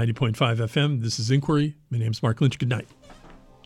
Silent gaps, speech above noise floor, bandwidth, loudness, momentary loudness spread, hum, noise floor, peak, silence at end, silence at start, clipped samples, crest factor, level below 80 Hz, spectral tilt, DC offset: none; 25 dB; 12 kHz; -24 LUFS; 6 LU; none; -48 dBFS; -8 dBFS; 0.3 s; 0 s; under 0.1%; 16 dB; -54 dBFS; -6 dB/octave; under 0.1%